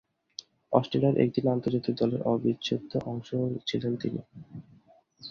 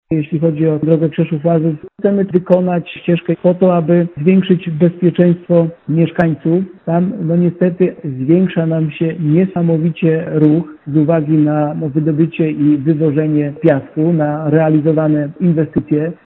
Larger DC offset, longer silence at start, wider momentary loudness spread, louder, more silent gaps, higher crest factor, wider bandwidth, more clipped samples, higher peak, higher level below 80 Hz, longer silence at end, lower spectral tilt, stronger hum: neither; first, 0.7 s vs 0.1 s; first, 20 LU vs 5 LU; second, -29 LUFS vs -14 LUFS; neither; first, 22 dB vs 14 dB; first, 7 kHz vs 3.9 kHz; neither; second, -6 dBFS vs 0 dBFS; second, -64 dBFS vs -52 dBFS; about the same, 0 s vs 0.1 s; second, -7.5 dB/octave vs -9 dB/octave; neither